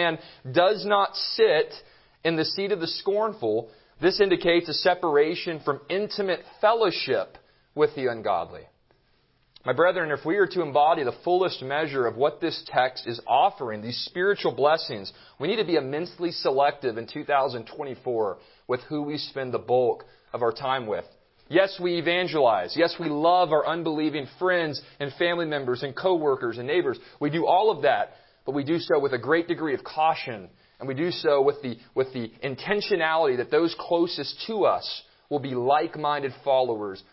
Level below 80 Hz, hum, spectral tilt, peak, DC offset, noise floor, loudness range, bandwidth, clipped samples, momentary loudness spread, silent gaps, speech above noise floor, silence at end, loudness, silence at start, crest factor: -66 dBFS; none; -9 dB/octave; -6 dBFS; under 0.1%; -65 dBFS; 4 LU; 5.8 kHz; under 0.1%; 11 LU; none; 40 dB; 0.15 s; -25 LUFS; 0 s; 18 dB